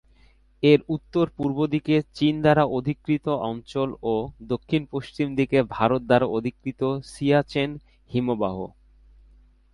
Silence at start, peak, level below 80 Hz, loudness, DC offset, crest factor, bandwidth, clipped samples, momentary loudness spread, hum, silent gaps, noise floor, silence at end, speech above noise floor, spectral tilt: 0.6 s; -4 dBFS; -52 dBFS; -24 LUFS; under 0.1%; 20 dB; 11.5 kHz; under 0.1%; 10 LU; none; none; -57 dBFS; 1.05 s; 33 dB; -7.5 dB/octave